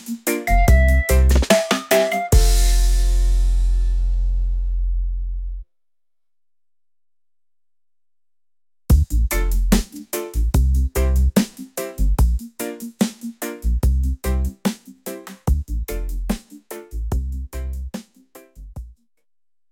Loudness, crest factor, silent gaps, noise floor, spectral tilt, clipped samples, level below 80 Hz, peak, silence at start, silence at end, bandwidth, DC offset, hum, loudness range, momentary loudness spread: -21 LUFS; 18 dB; none; under -90 dBFS; -5.5 dB/octave; under 0.1%; -20 dBFS; -2 dBFS; 0 s; 0.8 s; 17 kHz; under 0.1%; none; 13 LU; 15 LU